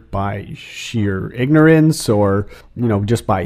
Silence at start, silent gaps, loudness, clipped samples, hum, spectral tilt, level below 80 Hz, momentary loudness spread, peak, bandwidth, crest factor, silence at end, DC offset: 0.1 s; none; -16 LUFS; under 0.1%; none; -6.5 dB/octave; -40 dBFS; 17 LU; 0 dBFS; 15.5 kHz; 16 dB; 0 s; under 0.1%